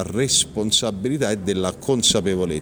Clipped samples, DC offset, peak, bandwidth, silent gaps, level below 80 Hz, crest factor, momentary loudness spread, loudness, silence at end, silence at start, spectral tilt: under 0.1%; under 0.1%; -4 dBFS; over 20 kHz; none; -46 dBFS; 16 dB; 6 LU; -20 LUFS; 0 s; 0 s; -3 dB/octave